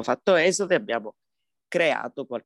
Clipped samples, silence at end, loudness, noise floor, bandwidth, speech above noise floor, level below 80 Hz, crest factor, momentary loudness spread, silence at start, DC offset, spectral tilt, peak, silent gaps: under 0.1%; 0.05 s; -24 LUFS; -74 dBFS; 12 kHz; 50 dB; -74 dBFS; 16 dB; 11 LU; 0 s; under 0.1%; -3.5 dB/octave; -8 dBFS; none